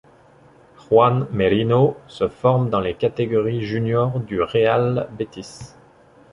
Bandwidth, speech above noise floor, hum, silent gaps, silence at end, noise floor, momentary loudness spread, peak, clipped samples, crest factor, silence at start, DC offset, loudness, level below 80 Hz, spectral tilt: 10.5 kHz; 31 dB; none; none; 0.65 s; -50 dBFS; 13 LU; -2 dBFS; under 0.1%; 18 dB; 0.9 s; under 0.1%; -20 LUFS; -50 dBFS; -8 dB/octave